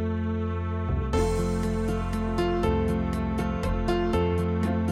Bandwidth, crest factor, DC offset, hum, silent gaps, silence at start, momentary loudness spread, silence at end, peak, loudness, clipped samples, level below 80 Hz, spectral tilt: 13.5 kHz; 14 dB; under 0.1%; none; none; 0 s; 4 LU; 0 s; -12 dBFS; -27 LUFS; under 0.1%; -34 dBFS; -7.5 dB/octave